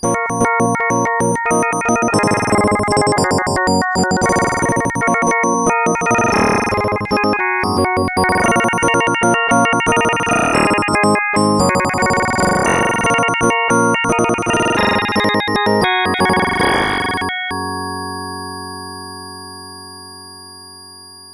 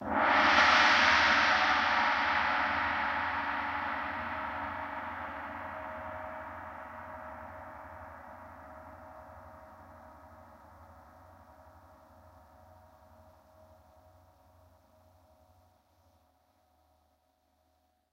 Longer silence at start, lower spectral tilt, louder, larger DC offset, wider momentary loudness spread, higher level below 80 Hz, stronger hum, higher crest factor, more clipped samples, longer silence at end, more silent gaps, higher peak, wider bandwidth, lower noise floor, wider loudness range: about the same, 0 s vs 0 s; first, -4 dB/octave vs -2.5 dB/octave; first, -15 LUFS vs -28 LUFS; neither; second, 15 LU vs 27 LU; first, -42 dBFS vs -60 dBFS; neither; second, 14 dB vs 22 dB; neither; second, 0 s vs 7.1 s; neither; first, 0 dBFS vs -12 dBFS; second, 11 kHz vs 16 kHz; second, -37 dBFS vs -74 dBFS; second, 6 LU vs 27 LU